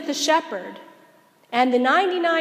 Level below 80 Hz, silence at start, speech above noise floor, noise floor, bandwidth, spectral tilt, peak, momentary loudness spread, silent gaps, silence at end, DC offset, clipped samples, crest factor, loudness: -86 dBFS; 0 s; 34 dB; -55 dBFS; 15.5 kHz; -2 dB/octave; -4 dBFS; 15 LU; none; 0 s; under 0.1%; under 0.1%; 18 dB; -20 LUFS